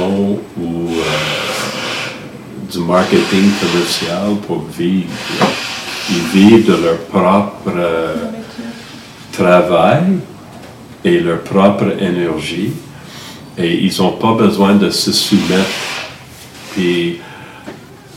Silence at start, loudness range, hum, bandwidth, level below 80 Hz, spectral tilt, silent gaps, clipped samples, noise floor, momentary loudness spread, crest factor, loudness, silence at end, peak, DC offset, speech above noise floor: 0 s; 3 LU; none; 16 kHz; -50 dBFS; -5 dB/octave; none; 0.3%; -34 dBFS; 20 LU; 14 dB; -14 LUFS; 0 s; 0 dBFS; under 0.1%; 22 dB